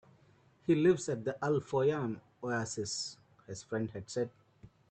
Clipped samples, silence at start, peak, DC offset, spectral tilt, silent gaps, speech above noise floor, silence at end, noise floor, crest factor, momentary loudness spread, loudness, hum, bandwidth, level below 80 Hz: under 0.1%; 0.7 s; -16 dBFS; under 0.1%; -5.5 dB/octave; none; 32 dB; 0.25 s; -65 dBFS; 18 dB; 13 LU; -34 LUFS; none; 9.2 kHz; -70 dBFS